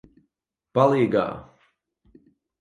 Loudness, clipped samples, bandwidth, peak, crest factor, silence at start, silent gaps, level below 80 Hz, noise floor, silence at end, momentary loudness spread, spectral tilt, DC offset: -22 LUFS; under 0.1%; 10.5 kHz; -4 dBFS; 22 dB; 0.75 s; none; -60 dBFS; -80 dBFS; 1.2 s; 13 LU; -8 dB/octave; under 0.1%